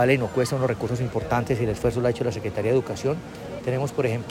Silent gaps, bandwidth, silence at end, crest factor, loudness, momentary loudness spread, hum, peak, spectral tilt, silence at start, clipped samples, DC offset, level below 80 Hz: none; 16 kHz; 0 s; 16 dB; -25 LUFS; 5 LU; none; -8 dBFS; -6.5 dB/octave; 0 s; under 0.1%; under 0.1%; -46 dBFS